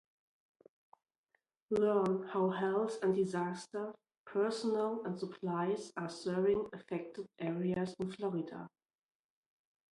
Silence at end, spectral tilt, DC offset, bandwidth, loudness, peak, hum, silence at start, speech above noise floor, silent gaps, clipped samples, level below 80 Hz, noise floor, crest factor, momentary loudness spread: 1.25 s; -6.5 dB/octave; under 0.1%; 11.5 kHz; -36 LUFS; -20 dBFS; none; 1.7 s; 45 dB; 4.18-4.25 s; under 0.1%; -76 dBFS; -81 dBFS; 18 dB; 10 LU